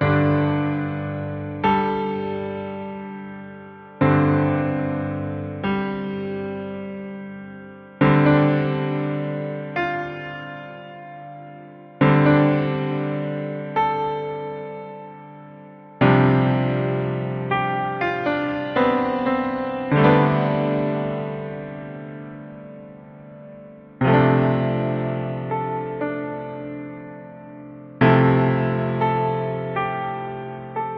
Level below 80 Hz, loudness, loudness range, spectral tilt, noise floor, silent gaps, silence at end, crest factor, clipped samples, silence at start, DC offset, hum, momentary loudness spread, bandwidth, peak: -52 dBFS; -22 LUFS; 6 LU; -10 dB/octave; -42 dBFS; none; 0 s; 20 dB; under 0.1%; 0 s; under 0.1%; none; 22 LU; 5.2 kHz; -2 dBFS